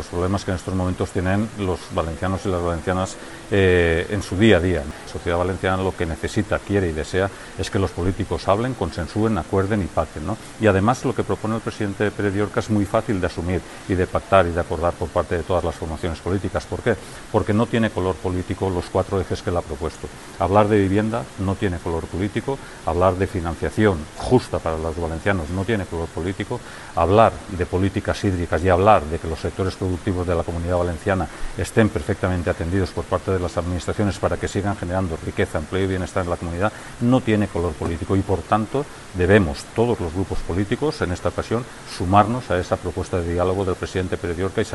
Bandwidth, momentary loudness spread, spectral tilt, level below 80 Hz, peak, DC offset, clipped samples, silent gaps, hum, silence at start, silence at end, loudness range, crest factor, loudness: 12 kHz; 9 LU; -6.5 dB/octave; -38 dBFS; 0 dBFS; under 0.1%; under 0.1%; none; none; 0 s; 0 s; 3 LU; 22 dB; -22 LUFS